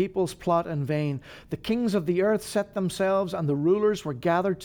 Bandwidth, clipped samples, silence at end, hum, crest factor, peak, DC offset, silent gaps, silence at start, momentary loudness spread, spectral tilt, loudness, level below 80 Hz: 19.5 kHz; under 0.1%; 0 s; none; 14 dB; -12 dBFS; under 0.1%; none; 0 s; 6 LU; -6.5 dB/octave; -26 LUFS; -56 dBFS